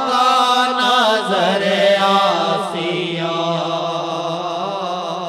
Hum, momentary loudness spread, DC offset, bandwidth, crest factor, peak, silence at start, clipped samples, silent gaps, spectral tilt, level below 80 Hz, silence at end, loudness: none; 9 LU; under 0.1%; 16 kHz; 16 dB; -2 dBFS; 0 s; under 0.1%; none; -4 dB/octave; -68 dBFS; 0 s; -17 LUFS